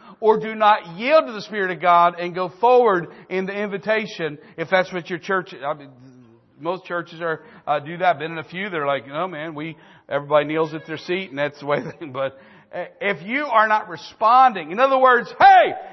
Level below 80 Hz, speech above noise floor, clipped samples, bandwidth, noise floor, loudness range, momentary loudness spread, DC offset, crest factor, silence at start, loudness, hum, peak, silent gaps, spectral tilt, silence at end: -68 dBFS; 30 dB; under 0.1%; 6.2 kHz; -50 dBFS; 8 LU; 14 LU; under 0.1%; 18 dB; 0.05 s; -20 LUFS; none; -2 dBFS; none; -6 dB/octave; 0 s